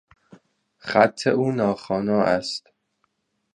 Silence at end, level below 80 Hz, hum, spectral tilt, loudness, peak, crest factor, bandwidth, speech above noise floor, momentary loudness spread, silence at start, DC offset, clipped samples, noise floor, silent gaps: 0.95 s; -60 dBFS; none; -5.5 dB/octave; -22 LUFS; -2 dBFS; 22 dB; 10.5 kHz; 51 dB; 12 LU; 0.85 s; under 0.1%; under 0.1%; -72 dBFS; none